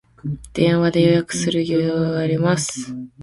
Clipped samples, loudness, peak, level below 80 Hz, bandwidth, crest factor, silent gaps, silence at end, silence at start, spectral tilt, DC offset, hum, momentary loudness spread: under 0.1%; -19 LUFS; -4 dBFS; -48 dBFS; 11.5 kHz; 16 dB; none; 0 s; 0.25 s; -5.5 dB/octave; under 0.1%; none; 13 LU